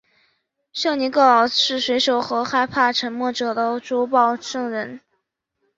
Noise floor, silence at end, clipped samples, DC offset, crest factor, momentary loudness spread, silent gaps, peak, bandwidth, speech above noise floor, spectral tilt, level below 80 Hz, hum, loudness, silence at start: -74 dBFS; 0.8 s; under 0.1%; under 0.1%; 18 dB; 11 LU; none; -2 dBFS; 7.8 kHz; 54 dB; -2.5 dB/octave; -64 dBFS; none; -19 LUFS; 0.75 s